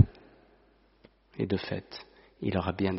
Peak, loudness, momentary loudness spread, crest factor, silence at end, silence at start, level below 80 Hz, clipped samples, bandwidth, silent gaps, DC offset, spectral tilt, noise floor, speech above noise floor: -6 dBFS; -32 LUFS; 18 LU; 26 dB; 0 s; 0 s; -54 dBFS; under 0.1%; 5.8 kHz; none; under 0.1%; -6 dB/octave; -64 dBFS; 32 dB